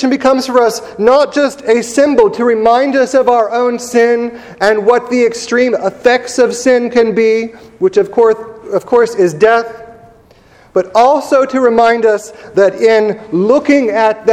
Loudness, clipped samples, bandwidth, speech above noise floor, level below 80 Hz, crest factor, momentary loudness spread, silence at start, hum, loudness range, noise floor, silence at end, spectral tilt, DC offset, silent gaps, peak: -11 LUFS; 0.3%; 13.5 kHz; 33 dB; -50 dBFS; 10 dB; 6 LU; 0 s; none; 2 LU; -44 dBFS; 0 s; -4.5 dB/octave; under 0.1%; none; 0 dBFS